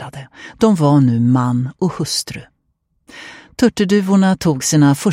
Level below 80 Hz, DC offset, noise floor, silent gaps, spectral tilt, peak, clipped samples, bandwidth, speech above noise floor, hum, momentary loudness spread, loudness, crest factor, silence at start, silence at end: -50 dBFS; under 0.1%; -66 dBFS; none; -6 dB/octave; 0 dBFS; under 0.1%; 16 kHz; 52 dB; none; 21 LU; -15 LUFS; 16 dB; 0 s; 0 s